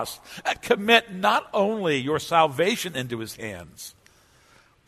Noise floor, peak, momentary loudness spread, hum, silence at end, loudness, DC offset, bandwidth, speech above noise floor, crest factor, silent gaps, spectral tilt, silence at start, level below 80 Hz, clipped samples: -58 dBFS; -4 dBFS; 18 LU; none; 1 s; -23 LUFS; under 0.1%; 13.5 kHz; 33 dB; 22 dB; none; -4 dB/octave; 0 s; -60 dBFS; under 0.1%